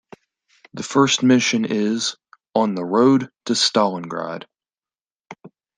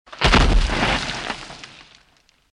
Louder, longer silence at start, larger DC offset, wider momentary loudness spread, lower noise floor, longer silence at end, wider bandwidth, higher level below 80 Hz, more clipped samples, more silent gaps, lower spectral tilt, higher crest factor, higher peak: about the same, -19 LUFS vs -19 LUFS; first, 0.75 s vs 0.1 s; neither; second, 13 LU vs 21 LU; first, under -90 dBFS vs -59 dBFS; second, 0.3 s vs 0.85 s; about the same, 10 kHz vs 11 kHz; second, -68 dBFS vs -24 dBFS; neither; first, 5.12-5.16 s vs none; about the same, -4 dB/octave vs -4.5 dB/octave; about the same, 18 dB vs 18 dB; about the same, -2 dBFS vs -2 dBFS